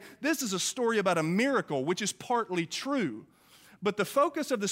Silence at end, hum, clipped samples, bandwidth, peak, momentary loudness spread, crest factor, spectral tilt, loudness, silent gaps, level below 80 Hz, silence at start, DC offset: 0 s; none; under 0.1%; 16 kHz; -14 dBFS; 5 LU; 16 dB; -4 dB/octave; -30 LUFS; none; -76 dBFS; 0 s; under 0.1%